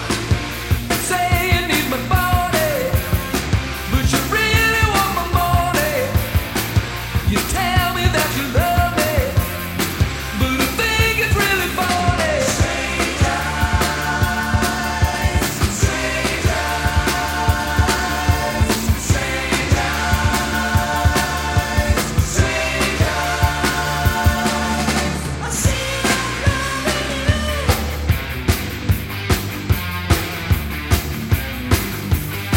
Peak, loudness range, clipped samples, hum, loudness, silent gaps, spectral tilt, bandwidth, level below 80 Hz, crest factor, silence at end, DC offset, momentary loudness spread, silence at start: 0 dBFS; 3 LU; under 0.1%; none; -18 LUFS; none; -4 dB/octave; 17 kHz; -26 dBFS; 18 dB; 0 s; under 0.1%; 5 LU; 0 s